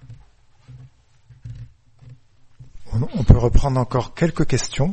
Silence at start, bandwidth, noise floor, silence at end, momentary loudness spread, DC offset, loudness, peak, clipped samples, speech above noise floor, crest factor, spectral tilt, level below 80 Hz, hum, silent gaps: 0.1 s; 8.6 kHz; -51 dBFS; 0 s; 24 LU; under 0.1%; -20 LUFS; 0 dBFS; under 0.1%; 34 dB; 20 dB; -6.5 dB/octave; -26 dBFS; none; none